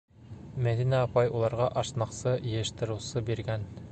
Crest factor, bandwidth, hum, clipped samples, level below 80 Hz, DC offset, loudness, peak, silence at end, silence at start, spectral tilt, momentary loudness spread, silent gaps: 18 dB; 9 kHz; none; under 0.1%; -52 dBFS; under 0.1%; -30 LUFS; -12 dBFS; 0 s; 0.2 s; -6 dB/octave; 9 LU; none